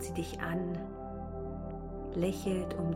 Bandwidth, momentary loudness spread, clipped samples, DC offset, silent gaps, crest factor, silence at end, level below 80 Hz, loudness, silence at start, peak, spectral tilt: 16 kHz; 9 LU; under 0.1%; under 0.1%; none; 18 dB; 0 s; -48 dBFS; -37 LUFS; 0 s; -18 dBFS; -6.5 dB/octave